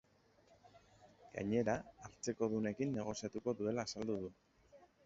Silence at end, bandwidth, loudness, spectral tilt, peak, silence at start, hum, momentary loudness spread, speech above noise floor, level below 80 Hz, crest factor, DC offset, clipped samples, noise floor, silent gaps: 0.2 s; 7.6 kHz; -41 LUFS; -6 dB/octave; -22 dBFS; 0.65 s; none; 9 LU; 31 dB; -70 dBFS; 20 dB; under 0.1%; under 0.1%; -71 dBFS; none